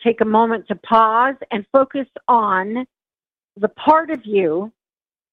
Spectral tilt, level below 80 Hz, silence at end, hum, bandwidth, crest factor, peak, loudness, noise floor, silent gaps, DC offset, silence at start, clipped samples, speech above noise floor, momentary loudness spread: -8 dB/octave; -62 dBFS; 0.65 s; none; 5.2 kHz; 16 dB; -2 dBFS; -18 LUFS; under -90 dBFS; none; under 0.1%; 0 s; under 0.1%; over 73 dB; 11 LU